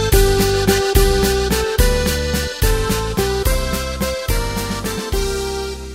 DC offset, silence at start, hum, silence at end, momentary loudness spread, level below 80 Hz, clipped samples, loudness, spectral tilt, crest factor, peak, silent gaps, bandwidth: under 0.1%; 0 s; none; 0 s; 7 LU; -20 dBFS; under 0.1%; -18 LUFS; -4 dB/octave; 16 dB; 0 dBFS; none; 16.5 kHz